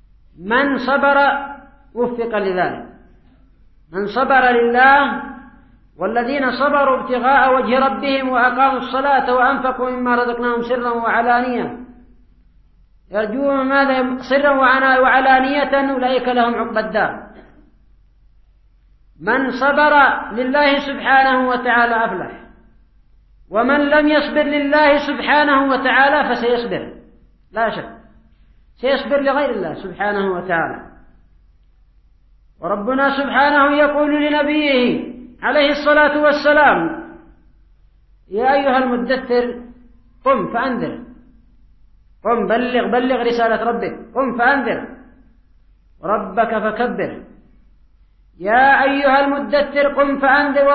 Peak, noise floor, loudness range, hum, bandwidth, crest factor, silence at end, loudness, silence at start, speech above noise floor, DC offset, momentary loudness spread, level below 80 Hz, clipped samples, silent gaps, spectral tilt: -2 dBFS; -51 dBFS; 7 LU; none; 6 kHz; 16 dB; 0 s; -16 LUFS; 0.4 s; 36 dB; under 0.1%; 13 LU; -48 dBFS; under 0.1%; none; -6.5 dB/octave